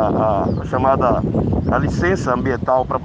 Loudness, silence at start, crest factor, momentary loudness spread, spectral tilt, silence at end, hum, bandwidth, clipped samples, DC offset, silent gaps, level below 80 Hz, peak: -18 LUFS; 0 s; 16 dB; 3 LU; -8 dB/octave; 0 s; none; 9.2 kHz; under 0.1%; under 0.1%; none; -32 dBFS; -2 dBFS